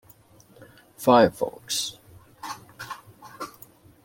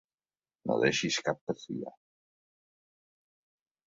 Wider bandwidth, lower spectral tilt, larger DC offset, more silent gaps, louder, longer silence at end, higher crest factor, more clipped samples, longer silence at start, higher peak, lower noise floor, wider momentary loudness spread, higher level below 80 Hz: first, 16.5 kHz vs 7.8 kHz; about the same, -4 dB/octave vs -3.5 dB/octave; neither; second, none vs 1.41-1.47 s; first, -22 LUFS vs -32 LUFS; second, 0.55 s vs 1.95 s; about the same, 24 dB vs 24 dB; neither; about the same, 0.6 s vs 0.65 s; first, -4 dBFS vs -12 dBFS; second, -54 dBFS vs under -90 dBFS; first, 21 LU vs 13 LU; first, -62 dBFS vs -72 dBFS